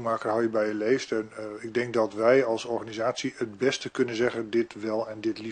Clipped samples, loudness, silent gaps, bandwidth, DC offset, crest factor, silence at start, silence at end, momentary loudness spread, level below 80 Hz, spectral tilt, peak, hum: under 0.1%; -27 LUFS; none; 9.8 kHz; under 0.1%; 18 dB; 0 s; 0 s; 9 LU; -68 dBFS; -5 dB/octave; -8 dBFS; none